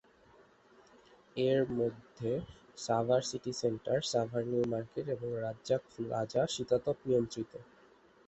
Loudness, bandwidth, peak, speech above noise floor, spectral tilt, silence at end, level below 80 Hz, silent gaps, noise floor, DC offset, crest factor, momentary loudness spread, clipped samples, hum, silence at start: -34 LUFS; 8.4 kHz; -16 dBFS; 29 dB; -5.5 dB/octave; 0.65 s; -66 dBFS; none; -63 dBFS; under 0.1%; 18 dB; 9 LU; under 0.1%; none; 1.35 s